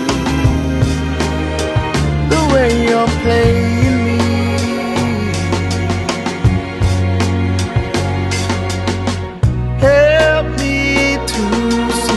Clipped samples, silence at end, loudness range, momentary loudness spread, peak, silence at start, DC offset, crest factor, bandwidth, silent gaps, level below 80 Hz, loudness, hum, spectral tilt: under 0.1%; 0 s; 3 LU; 6 LU; 0 dBFS; 0 s; under 0.1%; 14 dB; 12.5 kHz; none; -24 dBFS; -15 LUFS; none; -5.5 dB/octave